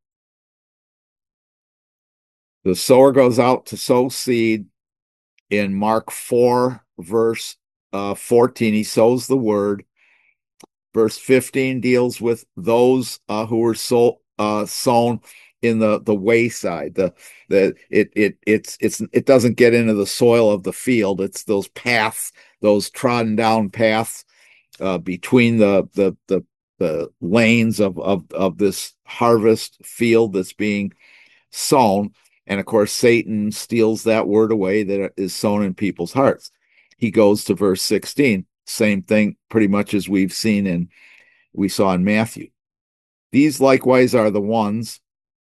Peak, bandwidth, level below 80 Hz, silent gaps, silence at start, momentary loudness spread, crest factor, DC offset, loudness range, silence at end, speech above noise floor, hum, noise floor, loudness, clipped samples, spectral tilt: 0 dBFS; 12.5 kHz; -62 dBFS; 5.02-5.46 s, 7.76-7.90 s, 26.63-26.74 s, 42.81-43.30 s; 2.65 s; 10 LU; 18 dB; under 0.1%; 3 LU; 0.55 s; 42 dB; none; -59 dBFS; -18 LUFS; under 0.1%; -5.5 dB/octave